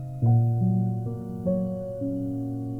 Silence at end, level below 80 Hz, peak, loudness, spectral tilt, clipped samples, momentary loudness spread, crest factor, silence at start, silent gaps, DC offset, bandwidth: 0 s; -52 dBFS; -12 dBFS; -27 LUFS; -12.5 dB/octave; under 0.1%; 9 LU; 14 dB; 0 s; none; under 0.1%; 1.5 kHz